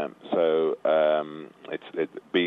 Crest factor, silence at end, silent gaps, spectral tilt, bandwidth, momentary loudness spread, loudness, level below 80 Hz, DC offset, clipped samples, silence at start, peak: 14 dB; 0 s; none; -7 dB/octave; 4.3 kHz; 15 LU; -25 LUFS; -78 dBFS; under 0.1%; under 0.1%; 0 s; -12 dBFS